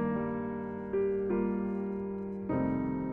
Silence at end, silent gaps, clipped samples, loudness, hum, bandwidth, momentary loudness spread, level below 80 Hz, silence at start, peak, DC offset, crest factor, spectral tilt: 0 s; none; under 0.1%; -33 LUFS; none; 3.4 kHz; 6 LU; -56 dBFS; 0 s; -20 dBFS; under 0.1%; 12 dB; -11.5 dB/octave